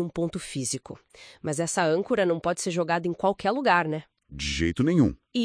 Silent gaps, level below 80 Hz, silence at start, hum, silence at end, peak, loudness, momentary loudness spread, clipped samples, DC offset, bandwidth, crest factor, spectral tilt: none; -48 dBFS; 0 s; none; 0 s; -6 dBFS; -26 LUFS; 12 LU; under 0.1%; under 0.1%; 10.5 kHz; 20 dB; -5 dB/octave